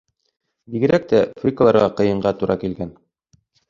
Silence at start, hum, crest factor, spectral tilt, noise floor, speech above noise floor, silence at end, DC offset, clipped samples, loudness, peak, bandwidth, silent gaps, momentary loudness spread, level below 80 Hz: 0.7 s; none; 18 dB; -8 dB/octave; -61 dBFS; 43 dB; 0.8 s; under 0.1%; under 0.1%; -18 LUFS; -2 dBFS; 7.4 kHz; none; 14 LU; -50 dBFS